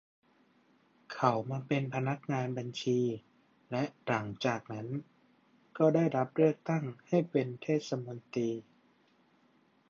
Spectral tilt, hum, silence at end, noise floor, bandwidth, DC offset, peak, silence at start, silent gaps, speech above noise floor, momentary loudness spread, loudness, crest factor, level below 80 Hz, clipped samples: -7 dB/octave; none; 1.3 s; -68 dBFS; 7.6 kHz; under 0.1%; -10 dBFS; 1.1 s; none; 36 dB; 11 LU; -33 LUFS; 24 dB; -76 dBFS; under 0.1%